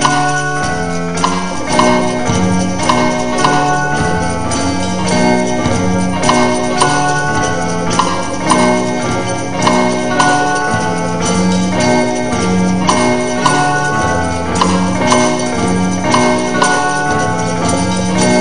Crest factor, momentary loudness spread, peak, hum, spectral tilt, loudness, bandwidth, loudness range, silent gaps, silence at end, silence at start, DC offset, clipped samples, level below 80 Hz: 14 dB; 4 LU; 0 dBFS; none; -4.5 dB/octave; -13 LUFS; 10.5 kHz; 1 LU; none; 0 s; 0 s; 5%; under 0.1%; -38 dBFS